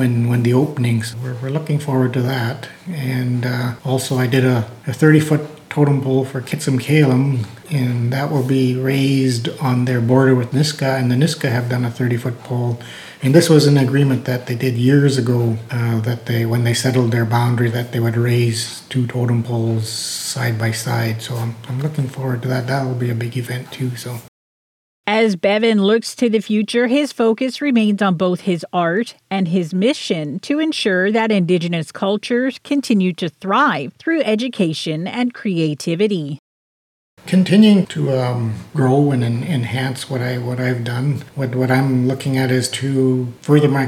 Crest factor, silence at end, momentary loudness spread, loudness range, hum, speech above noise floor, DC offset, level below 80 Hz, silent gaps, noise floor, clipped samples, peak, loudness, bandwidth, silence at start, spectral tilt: 16 dB; 0 s; 9 LU; 4 LU; none; over 73 dB; under 0.1%; -66 dBFS; 24.28-25.04 s, 36.39-37.17 s; under -90 dBFS; under 0.1%; 0 dBFS; -18 LUFS; 15.5 kHz; 0 s; -6 dB/octave